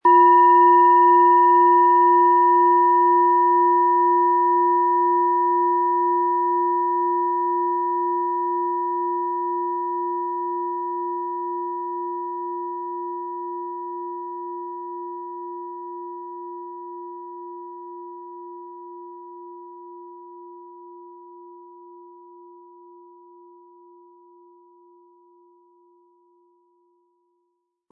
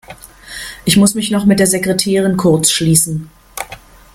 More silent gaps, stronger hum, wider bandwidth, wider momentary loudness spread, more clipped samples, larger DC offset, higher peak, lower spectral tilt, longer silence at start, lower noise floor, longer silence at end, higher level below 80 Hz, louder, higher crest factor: neither; neither; second, 3 kHz vs 16.5 kHz; first, 24 LU vs 17 LU; neither; neither; second, -6 dBFS vs 0 dBFS; first, -7.5 dB/octave vs -4 dB/octave; about the same, 0.05 s vs 0.1 s; first, -75 dBFS vs -37 dBFS; first, 6.3 s vs 0.35 s; second, under -90 dBFS vs -44 dBFS; second, -19 LUFS vs -12 LUFS; about the same, 16 dB vs 14 dB